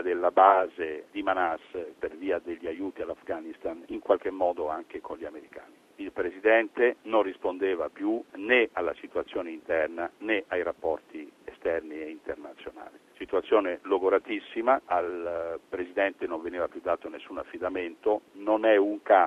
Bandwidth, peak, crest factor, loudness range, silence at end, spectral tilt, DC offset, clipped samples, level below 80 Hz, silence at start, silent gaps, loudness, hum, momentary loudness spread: 10.5 kHz; -4 dBFS; 24 dB; 6 LU; 0 s; -5.5 dB/octave; under 0.1%; under 0.1%; -66 dBFS; 0 s; none; -28 LUFS; none; 16 LU